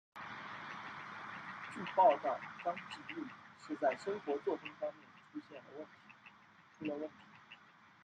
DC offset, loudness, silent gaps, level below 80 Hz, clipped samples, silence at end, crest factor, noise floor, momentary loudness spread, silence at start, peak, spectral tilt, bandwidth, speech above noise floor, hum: under 0.1%; -39 LUFS; none; -88 dBFS; under 0.1%; 0.15 s; 22 dB; -64 dBFS; 23 LU; 0.15 s; -18 dBFS; -5.5 dB/octave; 9.2 kHz; 26 dB; none